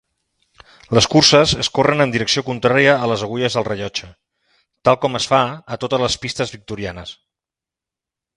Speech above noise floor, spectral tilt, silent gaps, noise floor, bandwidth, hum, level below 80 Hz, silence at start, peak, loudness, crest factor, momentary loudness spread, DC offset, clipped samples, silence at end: 71 dB; -4 dB/octave; none; -88 dBFS; 11.5 kHz; none; -46 dBFS; 0.9 s; 0 dBFS; -17 LUFS; 18 dB; 16 LU; under 0.1%; under 0.1%; 1.25 s